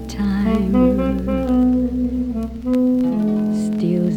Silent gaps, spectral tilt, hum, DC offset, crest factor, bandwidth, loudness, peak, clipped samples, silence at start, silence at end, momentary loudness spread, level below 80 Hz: none; -8.5 dB/octave; none; under 0.1%; 12 dB; 9.6 kHz; -19 LUFS; -4 dBFS; under 0.1%; 0 s; 0 s; 6 LU; -32 dBFS